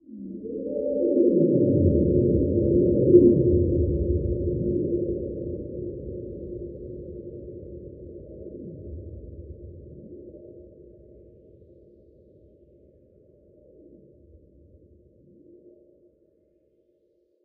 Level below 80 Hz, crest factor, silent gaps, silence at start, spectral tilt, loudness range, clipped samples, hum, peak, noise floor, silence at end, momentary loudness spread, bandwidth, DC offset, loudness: -40 dBFS; 24 dB; none; 0.1 s; -17 dB/octave; 23 LU; under 0.1%; none; -4 dBFS; -67 dBFS; 6.8 s; 23 LU; 0.7 kHz; under 0.1%; -23 LUFS